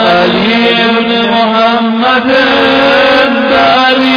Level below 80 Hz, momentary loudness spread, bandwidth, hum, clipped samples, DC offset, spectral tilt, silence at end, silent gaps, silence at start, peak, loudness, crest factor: -42 dBFS; 3 LU; 5.4 kHz; none; 0.5%; under 0.1%; -5.5 dB/octave; 0 s; none; 0 s; 0 dBFS; -7 LUFS; 8 dB